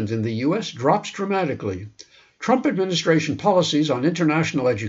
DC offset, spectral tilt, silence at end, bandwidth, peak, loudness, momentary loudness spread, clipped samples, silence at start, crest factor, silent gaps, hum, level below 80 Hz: under 0.1%; -5.5 dB/octave; 0 s; 8 kHz; -4 dBFS; -21 LUFS; 9 LU; under 0.1%; 0 s; 18 dB; none; none; -62 dBFS